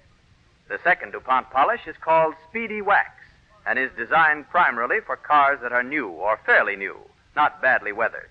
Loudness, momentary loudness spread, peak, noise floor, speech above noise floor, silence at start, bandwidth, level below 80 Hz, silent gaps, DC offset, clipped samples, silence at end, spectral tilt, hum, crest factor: -21 LUFS; 10 LU; -6 dBFS; -58 dBFS; 36 dB; 0.7 s; 6.6 kHz; -60 dBFS; none; under 0.1%; under 0.1%; 0.1 s; -6 dB/octave; none; 16 dB